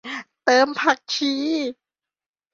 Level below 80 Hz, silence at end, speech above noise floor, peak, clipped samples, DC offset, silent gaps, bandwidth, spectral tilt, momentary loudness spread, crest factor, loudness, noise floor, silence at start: -70 dBFS; 0.8 s; over 69 dB; -4 dBFS; under 0.1%; under 0.1%; none; 7.8 kHz; -1.5 dB/octave; 11 LU; 20 dB; -21 LUFS; under -90 dBFS; 0.05 s